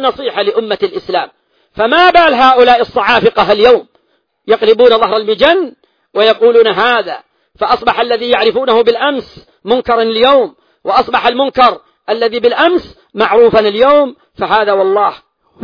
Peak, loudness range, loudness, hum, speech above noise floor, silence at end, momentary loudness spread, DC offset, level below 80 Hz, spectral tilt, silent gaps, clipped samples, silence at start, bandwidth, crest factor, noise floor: 0 dBFS; 3 LU; -10 LUFS; none; 50 dB; 0 s; 12 LU; under 0.1%; -46 dBFS; -5.5 dB/octave; none; 0.4%; 0 s; 5.4 kHz; 10 dB; -60 dBFS